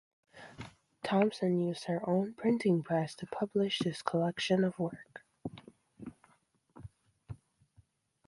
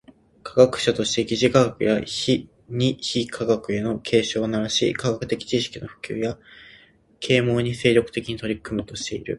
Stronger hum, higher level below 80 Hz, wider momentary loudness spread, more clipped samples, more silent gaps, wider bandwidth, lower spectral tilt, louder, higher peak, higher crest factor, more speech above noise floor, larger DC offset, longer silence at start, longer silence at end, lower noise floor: neither; second, -68 dBFS vs -52 dBFS; first, 22 LU vs 11 LU; neither; neither; about the same, 11.5 kHz vs 11.5 kHz; first, -6.5 dB/octave vs -5 dB/octave; second, -33 LUFS vs -22 LUFS; second, -14 dBFS vs -2 dBFS; about the same, 22 dB vs 22 dB; first, 39 dB vs 31 dB; neither; about the same, 0.35 s vs 0.45 s; first, 0.9 s vs 0 s; first, -71 dBFS vs -53 dBFS